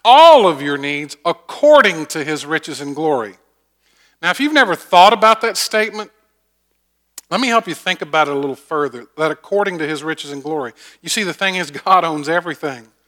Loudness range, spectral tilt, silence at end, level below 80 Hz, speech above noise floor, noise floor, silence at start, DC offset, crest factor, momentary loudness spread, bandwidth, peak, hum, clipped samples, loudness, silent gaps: 5 LU; -3 dB/octave; 0.25 s; -66 dBFS; 51 dB; -66 dBFS; 0.05 s; under 0.1%; 16 dB; 15 LU; 19 kHz; 0 dBFS; none; 0.2%; -15 LUFS; none